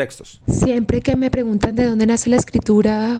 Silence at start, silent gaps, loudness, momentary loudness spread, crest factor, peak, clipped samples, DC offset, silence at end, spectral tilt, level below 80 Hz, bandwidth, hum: 0 s; none; -17 LUFS; 5 LU; 14 dB; -2 dBFS; under 0.1%; under 0.1%; 0 s; -6 dB/octave; -36 dBFS; 9.8 kHz; none